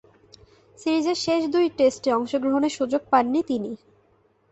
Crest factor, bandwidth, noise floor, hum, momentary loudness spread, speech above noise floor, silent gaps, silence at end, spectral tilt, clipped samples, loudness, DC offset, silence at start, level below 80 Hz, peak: 18 dB; 8.2 kHz; -62 dBFS; none; 8 LU; 40 dB; none; 0.75 s; -4.5 dB/octave; under 0.1%; -23 LUFS; under 0.1%; 0.8 s; -62 dBFS; -6 dBFS